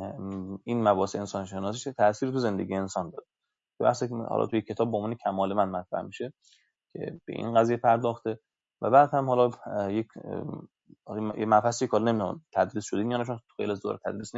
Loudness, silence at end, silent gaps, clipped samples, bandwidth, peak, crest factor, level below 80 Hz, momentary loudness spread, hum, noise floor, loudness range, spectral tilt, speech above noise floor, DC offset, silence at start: -28 LUFS; 0 s; none; under 0.1%; 8 kHz; -8 dBFS; 20 dB; -72 dBFS; 13 LU; none; -81 dBFS; 4 LU; -6 dB/octave; 53 dB; under 0.1%; 0 s